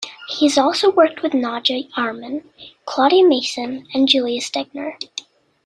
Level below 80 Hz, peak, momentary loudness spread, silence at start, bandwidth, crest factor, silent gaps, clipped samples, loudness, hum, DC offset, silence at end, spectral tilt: -66 dBFS; -2 dBFS; 16 LU; 0 s; 11.5 kHz; 18 dB; none; under 0.1%; -18 LUFS; none; under 0.1%; 0.45 s; -2.5 dB/octave